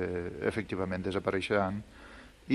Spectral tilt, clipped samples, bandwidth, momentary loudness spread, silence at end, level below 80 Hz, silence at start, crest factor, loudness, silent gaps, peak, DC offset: -6.5 dB/octave; under 0.1%; 12 kHz; 21 LU; 0 s; -56 dBFS; 0 s; 18 dB; -33 LUFS; none; -14 dBFS; under 0.1%